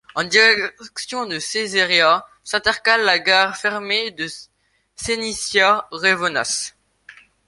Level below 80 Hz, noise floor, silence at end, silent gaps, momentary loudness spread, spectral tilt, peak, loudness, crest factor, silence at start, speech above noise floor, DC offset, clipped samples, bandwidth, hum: -56 dBFS; -47 dBFS; 0.35 s; none; 13 LU; -1 dB/octave; 0 dBFS; -17 LUFS; 20 dB; 0.15 s; 28 dB; under 0.1%; under 0.1%; 11.5 kHz; none